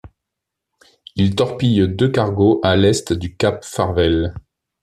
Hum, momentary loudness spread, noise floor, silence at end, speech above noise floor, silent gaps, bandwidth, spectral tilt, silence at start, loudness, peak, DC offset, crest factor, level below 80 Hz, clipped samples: none; 7 LU; -81 dBFS; 0.45 s; 65 dB; none; 13.5 kHz; -6 dB/octave; 0.05 s; -17 LUFS; 0 dBFS; under 0.1%; 16 dB; -44 dBFS; under 0.1%